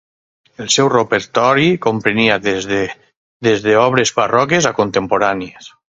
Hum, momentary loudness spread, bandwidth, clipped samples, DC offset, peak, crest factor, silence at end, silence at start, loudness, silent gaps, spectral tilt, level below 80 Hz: none; 7 LU; 8 kHz; under 0.1%; under 0.1%; 0 dBFS; 16 dB; 0.3 s; 0.6 s; -14 LUFS; 3.17-3.40 s; -4 dB/octave; -52 dBFS